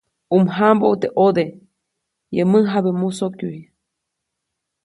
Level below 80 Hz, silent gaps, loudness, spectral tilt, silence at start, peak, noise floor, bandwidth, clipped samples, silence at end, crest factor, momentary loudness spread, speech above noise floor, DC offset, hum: -64 dBFS; none; -18 LUFS; -7.5 dB/octave; 0.3 s; 0 dBFS; -79 dBFS; 11.5 kHz; under 0.1%; 1.2 s; 18 dB; 12 LU; 62 dB; under 0.1%; none